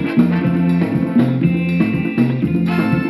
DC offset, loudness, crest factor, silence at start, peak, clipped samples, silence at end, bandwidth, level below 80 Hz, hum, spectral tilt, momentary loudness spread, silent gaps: under 0.1%; -16 LUFS; 14 dB; 0 s; -2 dBFS; under 0.1%; 0 s; 12 kHz; -46 dBFS; none; -9 dB/octave; 2 LU; none